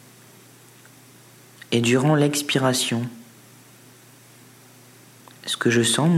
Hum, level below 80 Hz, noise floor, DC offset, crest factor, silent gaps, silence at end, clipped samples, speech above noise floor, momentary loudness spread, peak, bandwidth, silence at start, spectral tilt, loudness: none; -70 dBFS; -49 dBFS; under 0.1%; 18 dB; none; 0 s; under 0.1%; 30 dB; 10 LU; -6 dBFS; 16 kHz; 1.7 s; -4.5 dB/octave; -21 LUFS